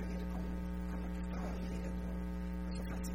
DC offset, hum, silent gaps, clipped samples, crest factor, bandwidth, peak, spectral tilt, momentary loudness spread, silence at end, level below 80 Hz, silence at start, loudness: 0.2%; none; none; under 0.1%; 10 dB; 16 kHz; -30 dBFS; -7 dB/octave; 1 LU; 0 s; -42 dBFS; 0 s; -42 LUFS